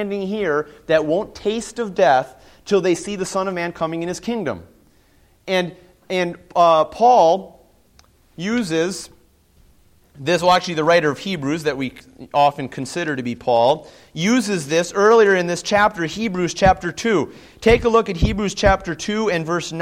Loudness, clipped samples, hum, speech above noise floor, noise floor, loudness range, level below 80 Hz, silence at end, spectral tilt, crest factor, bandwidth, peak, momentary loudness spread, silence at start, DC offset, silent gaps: -19 LUFS; under 0.1%; none; 36 dB; -55 dBFS; 6 LU; -38 dBFS; 0 s; -5 dB/octave; 18 dB; 15.5 kHz; -2 dBFS; 11 LU; 0 s; under 0.1%; none